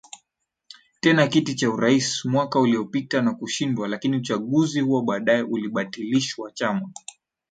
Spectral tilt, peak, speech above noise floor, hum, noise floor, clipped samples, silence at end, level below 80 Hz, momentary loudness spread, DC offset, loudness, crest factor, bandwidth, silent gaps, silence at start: -5 dB/octave; -6 dBFS; 56 dB; none; -78 dBFS; under 0.1%; 0.6 s; -66 dBFS; 8 LU; under 0.1%; -23 LUFS; 18 dB; 9.4 kHz; none; 0.15 s